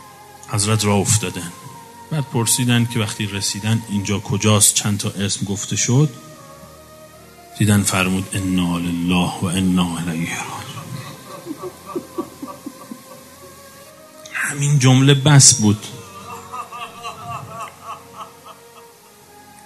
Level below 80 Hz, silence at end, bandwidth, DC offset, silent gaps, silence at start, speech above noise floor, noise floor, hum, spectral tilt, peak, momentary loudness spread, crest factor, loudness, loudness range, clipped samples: -54 dBFS; 0.8 s; 14 kHz; under 0.1%; none; 0 s; 29 dB; -46 dBFS; none; -4 dB/octave; 0 dBFS; 23 LU; 20 dB; -17 LUFS; 17 LU; under 0.1%